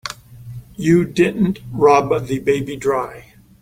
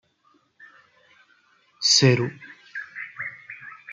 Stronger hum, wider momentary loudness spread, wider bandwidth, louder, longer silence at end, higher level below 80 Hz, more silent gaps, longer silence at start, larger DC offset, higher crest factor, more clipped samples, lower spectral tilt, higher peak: neither; about the same, 21 LU vs 23 LU; first, 16 kHz vs 9.6 kHz; first, -17 LUFS vs -21 LUFS; first, 0.4 s vs 0 s; first, -48 dBFS vs -70 dBFS; neither; second, 0.05 s vs 1.8 s; neither; second, 16 dB vs 22 dB; neither; first, -6.5 dB/octave vs -3.5 dB/octave; about the same, -2 dBFS vs -4 dBFS